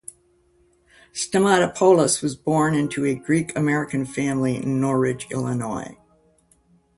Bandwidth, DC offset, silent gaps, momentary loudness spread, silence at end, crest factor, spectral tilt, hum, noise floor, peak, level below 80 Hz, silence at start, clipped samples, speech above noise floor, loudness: 11.5 kHz; under 0.1%; none; 12 LU; 1.05 s; 20 dB; -5 dB/octave; none; -61 dBFS; -4 dBFS; -56 dBFS; 1.15 s; under 0.1%; 40 dB; -21 LUFS